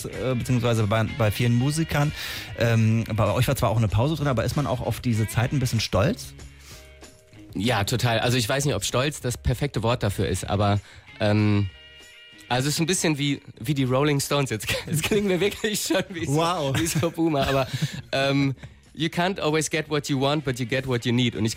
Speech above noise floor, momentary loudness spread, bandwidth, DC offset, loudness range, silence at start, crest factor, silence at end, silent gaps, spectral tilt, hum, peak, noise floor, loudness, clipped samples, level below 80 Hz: 24 dB; 6 LU; 16 kHz; under 0.1%; 2 LU; 0 s; 12 dB; 0 s; none; -5 dB/octave; none; -12 dBFS; -48 dBFS; -24 LUFS; under 0.1%; -44 dBFS